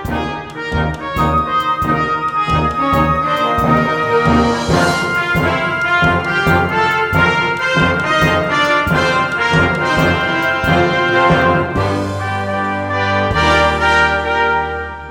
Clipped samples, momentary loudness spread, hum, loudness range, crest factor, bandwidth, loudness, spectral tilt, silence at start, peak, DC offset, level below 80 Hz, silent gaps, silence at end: under 0.1%; 6 LU; none; 1 LU; 14 dB; 18 kHz; -14 LUFS; -5.5 dB/octave; 0 s; 0 dBFS; 0.1%; -32 dBFS; none; 0 s